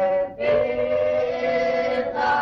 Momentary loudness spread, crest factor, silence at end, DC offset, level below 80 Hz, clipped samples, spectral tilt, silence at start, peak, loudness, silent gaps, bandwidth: 2 LU; 10 dB; 0 s; under 0.1%; -52 dBFS; under 0.1%; -5.5 dB/octave; 0 s; -10 dBFS; -22 LUFS; none; 6.8 kHz